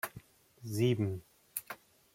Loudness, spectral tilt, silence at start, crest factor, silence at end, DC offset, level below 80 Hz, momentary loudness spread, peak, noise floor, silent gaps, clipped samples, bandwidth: -36 LUFS; -6 dB/octave; 0.05 s; 20 dB; 0.4 s; under 0.1%; -70 dBFS; 19 LU; -18 dBFS; -56 dBFS; none; under 0.1%; 16.5 kHz